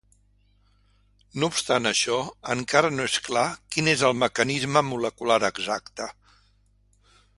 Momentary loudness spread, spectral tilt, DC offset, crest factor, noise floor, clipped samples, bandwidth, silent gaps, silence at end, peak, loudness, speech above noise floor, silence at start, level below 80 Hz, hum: 8 LU; -3 dB/octave; under 0.1%; 24 dB; -62 dBFS; under 0.1%; 11.5 kHz; none; 1.25 s; -4 dBFS; -24 LUFS; 38 dB; 1.35 s; -60 dBFS; 50 Hz at -55 dBFS